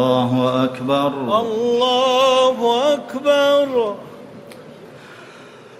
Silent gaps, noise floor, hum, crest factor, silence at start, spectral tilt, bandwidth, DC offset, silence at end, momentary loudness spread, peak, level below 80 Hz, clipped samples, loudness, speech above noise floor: none; -41 dBFS; none; 14 dB; 0 s; -5 dB/octave; 14.5 kHz; under 0.1%; 0.05 s; 16 LU; -4 dBFS; -62 dBFS; under 0.1%; -17 LUFS; 24 dB